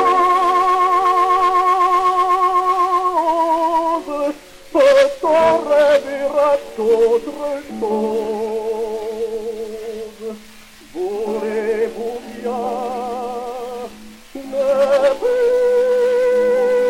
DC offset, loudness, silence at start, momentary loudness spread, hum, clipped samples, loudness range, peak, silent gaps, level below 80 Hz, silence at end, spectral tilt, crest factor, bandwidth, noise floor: under 0.1%; -17 LUFS; 0 s; 14 LU; none; under 0.1%; 9 LU; 0 dBFS; none; -50 dBFS; 0 s; -4 dB/octave; 16 dB; 16 kHz; -41 dBFS